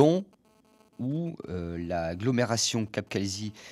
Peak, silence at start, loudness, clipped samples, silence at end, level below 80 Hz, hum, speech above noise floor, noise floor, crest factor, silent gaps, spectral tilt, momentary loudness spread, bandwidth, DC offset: -8 dBFS; 0 s; -30 LUFS; under 0.1%; 0 s; -56 dBFS; none; 34 dB; -62 dBFS; 22 dB; none; -5 dB/octave; 10 LU; 15 kHz; under 0.1%